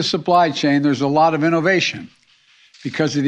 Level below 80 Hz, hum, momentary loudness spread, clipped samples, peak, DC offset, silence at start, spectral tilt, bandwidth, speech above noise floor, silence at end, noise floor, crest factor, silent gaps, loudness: -62 dBFS; none; 11 LU; under 0.1%; -4 dBFS; under 0.1%; 0 s; -5 dB/octave; 9.4 kHz; 37 dB; 0 s; -54 dBFS; 14 dB; none; -17 LUFS